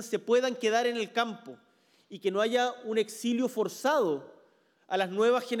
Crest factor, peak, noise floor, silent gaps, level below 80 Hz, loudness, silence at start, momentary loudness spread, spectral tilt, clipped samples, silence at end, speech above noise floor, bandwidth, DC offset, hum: 16 dB; -14 dBFS; -65 dBFS; none; -90 dBFS; -29 LUFS; 0 s; 8 LU; -4 dB/octave; under 0.1%; 0 s; 36 dB; 17 kHz; under 0.1%; none